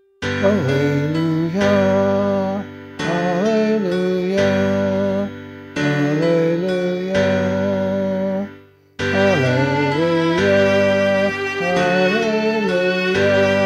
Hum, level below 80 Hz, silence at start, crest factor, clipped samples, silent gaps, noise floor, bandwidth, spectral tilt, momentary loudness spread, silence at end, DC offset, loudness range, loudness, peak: none; -52 dBFS; 0.2 s; 14 dB; under 0.1%; none; -44 dBFS; 12.5 kHz; -6.5 dB/octave; 7 LU; 0 s; under 0.1%; 3 LU; -18 LUFS; -4 dBFS